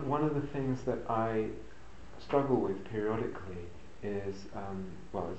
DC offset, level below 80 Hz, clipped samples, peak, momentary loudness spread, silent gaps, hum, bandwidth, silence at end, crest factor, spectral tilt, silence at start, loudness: 0.6%; -56 dBFS; under 0.1%; -14 dBFS; 17 LU; none; none; 8.2 kHz; 0 s; 22 dB; -8 dB/octave; 0 s; -35 LUFS